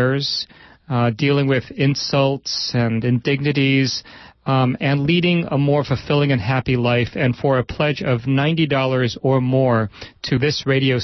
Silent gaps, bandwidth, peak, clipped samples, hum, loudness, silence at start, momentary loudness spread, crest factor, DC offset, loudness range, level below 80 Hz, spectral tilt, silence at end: none; 6.2 kHz; -6 dBFS; under 0.1%; none; -19 LUFS; 0 s; 5 LU; 12 dB; under 0.1%; 1 LU; -48 dBFS; -6.5 dB/octave; 0 s